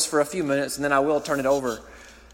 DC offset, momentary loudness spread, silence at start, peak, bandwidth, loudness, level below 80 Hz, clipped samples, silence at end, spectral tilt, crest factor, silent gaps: under 0.1%; 5 LU; 0 s; -8 dBFS; 16.5 kHz; -24 LUFS; -54 dBFS; under 0.1%; 0.2 s; -3.5 dB/octave; 16 dB; none